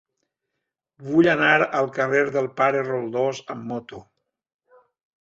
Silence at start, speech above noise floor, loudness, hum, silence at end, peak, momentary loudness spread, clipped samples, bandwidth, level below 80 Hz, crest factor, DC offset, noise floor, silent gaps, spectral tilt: 1 s; 60 dB; -21 LUFS; none; 1.3 s; -4 dBFS; 16 LU; under 0.1%; 7.8 kHz; -66 dBFS; 20 dB; under 0.1%; -82 dBFS; none; -6 dB/octave